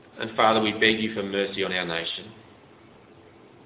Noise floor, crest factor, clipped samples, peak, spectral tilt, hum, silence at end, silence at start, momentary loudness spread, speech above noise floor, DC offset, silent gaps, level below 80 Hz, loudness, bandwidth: -52 dBFS; 22 dB; under 0.1%; -4 dBFS; -8 dB/octave; none; 1.25 s; 0.15 s; 11 LU; 27 dB; under 0.1%; none; -60 dBFS; -24 LUFS; 4 kHz